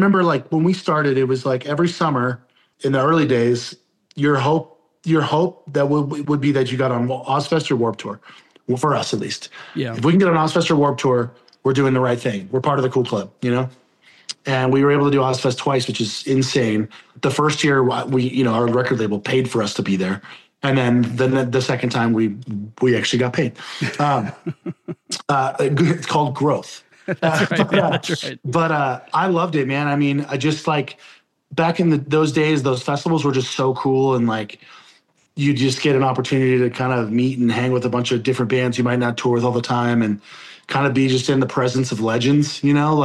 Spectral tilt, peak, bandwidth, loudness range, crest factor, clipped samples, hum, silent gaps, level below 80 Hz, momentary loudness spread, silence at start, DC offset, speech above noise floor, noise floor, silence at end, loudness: -6 dB/octave; -4 dBFS; 12 kHz; 2 LU; 16 dB; under 0.1%; none; none; -62 dBFS; 9 LU; 0 s; under 0.1%; 36 dB; -55 dBFS; 0 s; -19 LUFS